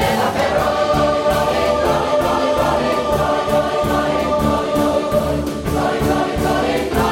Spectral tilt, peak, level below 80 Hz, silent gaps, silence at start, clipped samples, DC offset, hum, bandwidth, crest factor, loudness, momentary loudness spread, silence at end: -5.5 dB/octave; -4 dBFS; -32 dBFS; none; 0 s; under 0.1%; under 0.1%; none; 16.5 kHz; 12 dB; -17 LUFS; 2 LU; 0 s